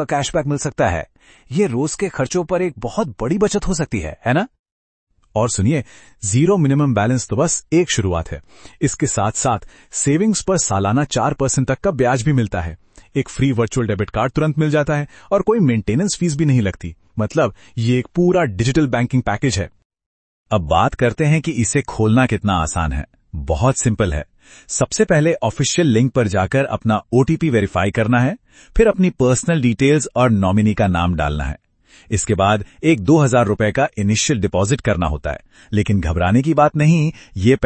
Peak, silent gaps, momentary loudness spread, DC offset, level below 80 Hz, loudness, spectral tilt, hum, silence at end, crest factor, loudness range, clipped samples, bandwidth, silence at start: 0 dBFS; 4.59-4.64 s, 4.72-5.07 s, 19.85-19.90 s, 20.06-20.46 s; 9 LU; under 0.1%; -34 dBFS; -18 LUFS; -5.5 dB/octave; none; 0 s; 16 dB; 3 LU; under 0.1%; 8.8 kHz; 0 s